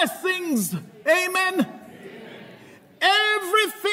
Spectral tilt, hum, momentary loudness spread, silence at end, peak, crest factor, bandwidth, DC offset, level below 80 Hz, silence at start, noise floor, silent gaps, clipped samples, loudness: -3 dB/octave; none; 22 LU; 0 s; -6 dBFS; 16 dB; 16 kHz; under 0.1%; -76 dBFS; 0 s; -48 dBFS; none; under 0.1%; -21 LUFS